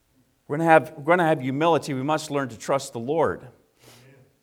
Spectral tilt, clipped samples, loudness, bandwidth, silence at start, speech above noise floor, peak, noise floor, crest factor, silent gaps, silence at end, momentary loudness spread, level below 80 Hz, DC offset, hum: -5.5 dB/octave; under 0.1%; -23 LUFS; 17.5 kHz; 0.5 s; 31 dB; -2 dBFS; -53 dBFS; 22 dB; none; 0.9 s; 10 LU; -66 dBFS; under 0.1%; none